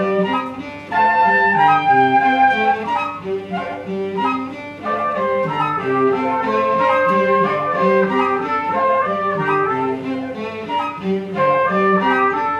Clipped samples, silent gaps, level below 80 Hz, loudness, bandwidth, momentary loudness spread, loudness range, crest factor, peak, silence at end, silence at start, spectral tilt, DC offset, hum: under 0.1%; none; -58 dBFS; -17 LUFS; 9.4 kHz; 11 LU; 5 LU; 14 dB; -2 dBFS; 0 s; 0 s; -7 dB/octave; under 0.1%; none